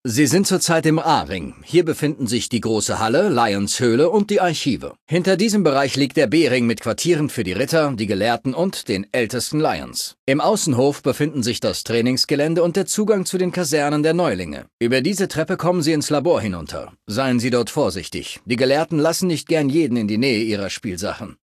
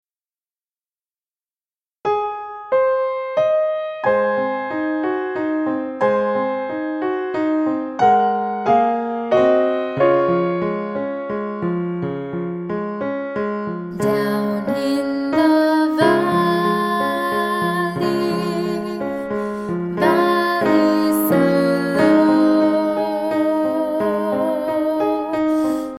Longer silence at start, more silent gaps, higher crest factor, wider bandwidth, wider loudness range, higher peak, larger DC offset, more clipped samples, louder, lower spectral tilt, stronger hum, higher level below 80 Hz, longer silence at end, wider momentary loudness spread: second, 0.05 s vs 2.05 s; first, 5.01-5.07 s, 10.19-10.27 s, 14.73-14.79 s vs none; about the same, 16 dB vs 16 dB; second, 14.5 kHz vs 16 kHz; second, 3 LU vs 6 LU; about the same, -4 dBFS vs -2 dBFS; neither; neither; about the same, -19 LUFS vs -19 LUFS; second, -4.5 dB/octave vs -6.5 dB/octave; neither; first, -50 dBFS vs -58 dBFS; about the same, 0.1 s vs 0 s; about the same, 8 LU vs 9 LU